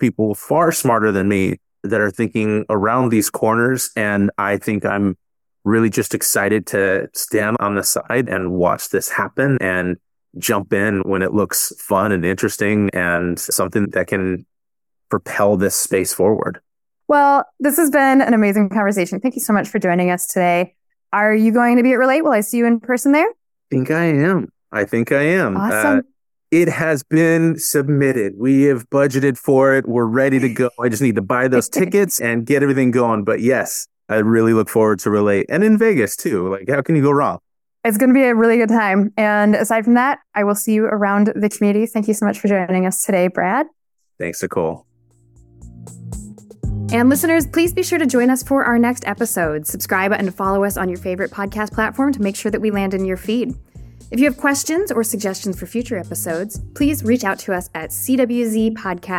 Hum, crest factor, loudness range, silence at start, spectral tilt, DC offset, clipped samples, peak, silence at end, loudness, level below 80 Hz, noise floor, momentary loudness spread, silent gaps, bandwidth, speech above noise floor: none; 14 dB; 5 LU; 0 s; -5 dB/octave; under 0.1%; under 0.1%; -2 dBFS; 0 s; -17 LUFS; -46 dBFS; -86 dBFS; 9 LU; none; 18.5 kHz; 70 dB